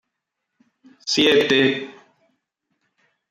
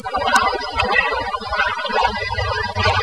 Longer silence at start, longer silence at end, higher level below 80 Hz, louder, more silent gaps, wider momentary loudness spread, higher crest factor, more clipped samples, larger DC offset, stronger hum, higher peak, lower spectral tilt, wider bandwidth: first, 1.05 s vs 0 s; first, 1.4 s vs 0 s; second, -66 dBFS vs -36 dBFS; about the same, -18 LUFS vs -19 LUFS; neither; first, 17 LU vs 5 LU; about the same, 18 dB vs 20 dB; neither; second, under 0.1% vs 0.4%; neither; second, -4 dBFS vs 0 dBFS; about the same, -3.5 dB/octave vs -3.5 dB/octave; first, 15 kHz vs 11 kHz